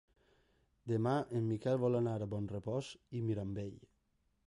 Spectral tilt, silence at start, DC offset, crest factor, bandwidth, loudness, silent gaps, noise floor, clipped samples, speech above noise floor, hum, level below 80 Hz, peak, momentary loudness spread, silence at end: -8 dB/octave; 0.85 s; under 0.1%; 16 dB; 11 kHz; -38 LUFS; none; -78 dBFS; under 0.1%; 42 dB; none; -66 dBFS; -22 dBFS; 11 LU; 0.65 s